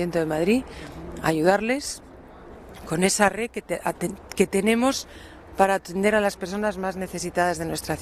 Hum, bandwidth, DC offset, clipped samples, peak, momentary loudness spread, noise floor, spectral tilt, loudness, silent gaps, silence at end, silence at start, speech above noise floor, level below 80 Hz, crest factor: none; 14.5 kHz; under 0.1%; under 0.1%; -2 dBFS; 17 LU; -44 dBFS; -4.5 dB/octave; -24 LUFS; none; 0 s; 0 s; 20 dB; -48 dBFS; 22 dB